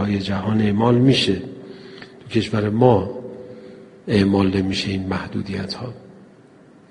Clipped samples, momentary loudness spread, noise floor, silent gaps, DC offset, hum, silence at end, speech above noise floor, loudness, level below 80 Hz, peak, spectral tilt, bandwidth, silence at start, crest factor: under 0.1%; 22 LU; -48 dBFS; none; under 0.1%; none; 0.8 s; 29 dB; -20 LUFS; -50 dBFS; -2 dBFS; -6.5 dB/octave; 10.5 kHz; 0 s; 20 dB